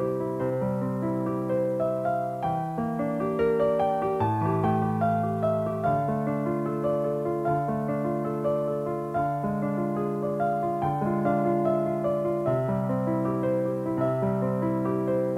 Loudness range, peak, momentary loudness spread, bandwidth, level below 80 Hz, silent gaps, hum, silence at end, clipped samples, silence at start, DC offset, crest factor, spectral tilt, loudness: 2 LU; -12 dBFS; 4 LU; 15 kHz; -56 dBFS; none; none; 0 s; under 0.1%; 0 s; under 0.1%; 14 dB; -9.5 dB/octave; -27 LUFS